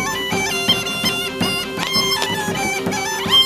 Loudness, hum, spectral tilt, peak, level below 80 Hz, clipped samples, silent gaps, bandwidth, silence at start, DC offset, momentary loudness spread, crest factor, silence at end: -18 LUFS; none; -2 dB/octave; 0 dBFS; -48 dBFS; under 0.1%; none; 15.5 kHz; 0 s; under 0.1%; 4 LU; 18 dB; 0 s